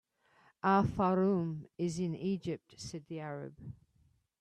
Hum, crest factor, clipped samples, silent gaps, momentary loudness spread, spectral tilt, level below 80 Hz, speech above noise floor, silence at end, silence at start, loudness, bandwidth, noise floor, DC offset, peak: none; 18 dB; under 0.1%; none; 16 LU; -7 dB/octave; -62 dBFS; 37 dB; 0.7 s; 0.65 s; -34 LUFS; 9.8 kHz; -71 dBFS; under 0.1%; -18 dBFS